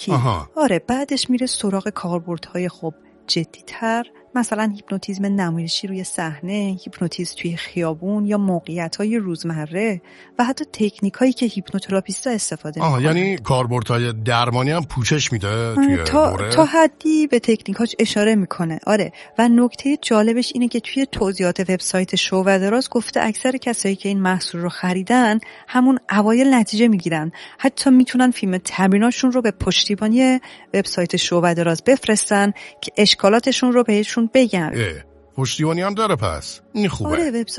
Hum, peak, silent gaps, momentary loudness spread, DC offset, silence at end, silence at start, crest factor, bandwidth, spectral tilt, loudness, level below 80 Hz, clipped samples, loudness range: none; 0 dBFS; none; 10 LU; under 0.1%; 0 s; 0 s; 18 dB; 11.5 kHz; -5 dB/octave; -19 LUFS; -48 dBFS; under 0.1%; 6 LU